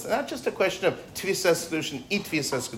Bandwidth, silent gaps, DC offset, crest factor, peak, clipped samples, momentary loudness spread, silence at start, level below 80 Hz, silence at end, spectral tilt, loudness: 16 kHz; none; under 0.1%; 16 dB; -10 dBFS; under 0.1%; 6 LU; 0 s; -60 dBFS; 0 s; -3.5 dB/octave; -27 LUFS